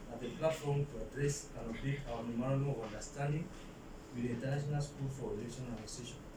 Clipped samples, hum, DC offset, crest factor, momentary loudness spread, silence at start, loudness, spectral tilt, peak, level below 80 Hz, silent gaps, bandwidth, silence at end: under 0.1%; none; under 0.1%; 18 dB; 9 LU; 0 s; -40 LUFS; -6 dB/octave; -20 dBFS; -54 dBFS; none; 15.5 kHz; 0 s